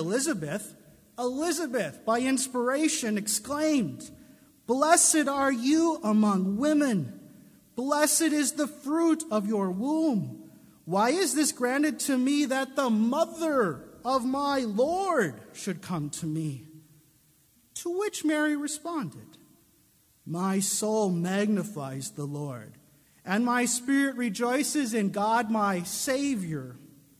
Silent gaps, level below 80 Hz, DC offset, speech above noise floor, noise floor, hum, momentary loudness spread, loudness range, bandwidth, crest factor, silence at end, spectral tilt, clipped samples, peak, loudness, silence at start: none; -68 dBFS; under 0.1%; 36 dB; -63 dBFS; none; 12 LU; 7 LU; 16 kHz; 20 dB; 0.35 s; -4 dB/octave; under 0.1%; -8 dBFS; -27 LUFS; 0 s